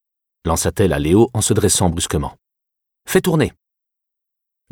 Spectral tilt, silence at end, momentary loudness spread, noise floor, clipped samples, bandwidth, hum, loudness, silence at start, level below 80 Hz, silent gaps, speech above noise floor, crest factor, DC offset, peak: -4.5 dB/octave; 1.2 s; 8 LU; -81 dBFS; under 0.1%; 18.5 kHz; none; -17 LUFS; 0.45 s; -36 dBFS; none; 65 dB; 18 dB; under 0.1%; -2 dBFS